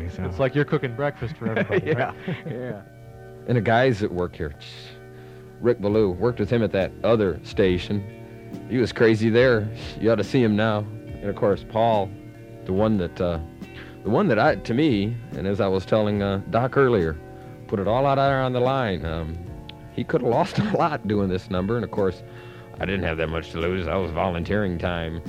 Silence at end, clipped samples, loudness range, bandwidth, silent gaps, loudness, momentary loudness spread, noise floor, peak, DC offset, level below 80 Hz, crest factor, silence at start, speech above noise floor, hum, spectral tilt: 0 s; under 0.1%; 4 LU; 14.5 kHz; none; -23 LUFS; 19 LU; -42 dBFS; -4 dBFS; under 0.1%; -44 dBFS; 18 dB; 0 s; 20 dB; none; -7.5 dB/octave